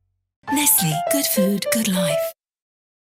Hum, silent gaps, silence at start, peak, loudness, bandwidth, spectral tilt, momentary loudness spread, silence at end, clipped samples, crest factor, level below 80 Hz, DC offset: none; none; 0.45 s; -2 dBFS; -19 LUFS; 17 kHz; -3.5 dB/octave; 9 LU; 0.75 s; under 0.1%; 20 dB; -62 dBFS; under 0.1%